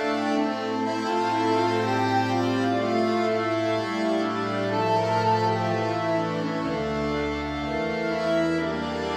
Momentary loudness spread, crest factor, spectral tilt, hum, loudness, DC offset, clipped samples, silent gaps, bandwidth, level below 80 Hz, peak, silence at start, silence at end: 4 LU; 14 dB; -6 dB/octave; none; -25 LUFS; under 0.1%; under 0.1%; none; 14 kHz; -50 dBFS; -12 dBFS; 0 s; 0 s